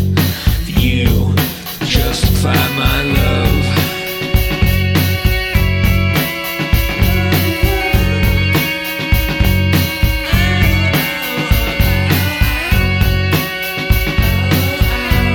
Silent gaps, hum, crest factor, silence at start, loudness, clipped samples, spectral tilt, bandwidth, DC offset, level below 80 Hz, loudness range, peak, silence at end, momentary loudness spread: none; none; 14 dB; 0 s; -14 LUFS; under 0.1%; -5 dB/octave; 18.5 kHz; under 0.1%; -20 dBFS; 1 LU; 0 dBFS; 0 s; 3 LU